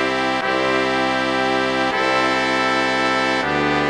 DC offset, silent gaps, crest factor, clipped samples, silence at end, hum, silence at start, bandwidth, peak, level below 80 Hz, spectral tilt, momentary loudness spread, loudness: under 0.1%; none; 16 dB; under 0.1%; 0 s; none; 0 s; 13.5 kHz; -2 dBFS; -48 dBFS; -4 dB/octave; 2 LU; -18 LUFS